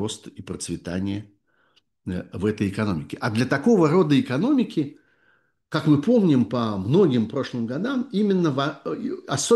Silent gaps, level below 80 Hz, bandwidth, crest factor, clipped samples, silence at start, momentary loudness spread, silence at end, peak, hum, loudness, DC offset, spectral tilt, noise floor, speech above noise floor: none; -58 dBFS; 12.5 kHz; 16 dB; under 0.1%; 0 s; 13 LU; 0 s; -6 dBFS; none; -23 LUFS; under 0.1%; -6 dB/octave; -65 dBFS; 43 dB